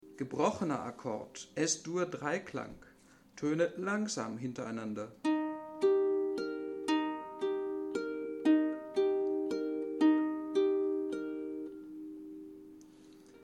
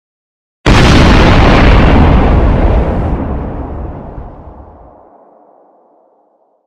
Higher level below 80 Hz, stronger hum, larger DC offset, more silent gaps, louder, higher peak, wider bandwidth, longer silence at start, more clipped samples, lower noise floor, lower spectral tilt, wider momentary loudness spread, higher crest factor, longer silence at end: second, -74 dBFS vs -14 dBFS; neither; neither; neither; second, -34 LUFS vs -9 LUFS; second, -16 dBFS vs 0 dBFS; about the same, 11 kHz vs 10.5 kHz; second, 0.05 s vs 0.65 s; second, under 0.1% vs 0.2%; first, -60 dBFS vs -53 dBFS; second, -5 dB/octave vs -6.5 dB/octave; second, 14 LU vs 19 LU; first, 18 dB vs 10 dB; second, 0 s vs 2.15 s